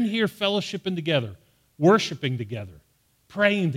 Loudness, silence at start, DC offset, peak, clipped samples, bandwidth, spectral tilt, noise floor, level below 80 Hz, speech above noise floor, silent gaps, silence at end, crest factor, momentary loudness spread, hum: -24 LUFS; 0 s; under 0.1%; -6 dBFS; under 0.1%; 16 kHz; -5.5 dB/octave; -61 dBFS; -64 dBFS; 37 dB; none; 0 s; 20 dB; 17 LU; none